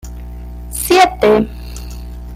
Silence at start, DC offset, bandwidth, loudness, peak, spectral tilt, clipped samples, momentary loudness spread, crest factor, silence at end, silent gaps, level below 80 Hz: 0.05 s; under 0.1%; 16 kHz; -13 LUFS; 0 dBFS; -4 dB/octave; under 0.1%; 21 LU; 16 dB; 0 s; none; -28 dBFS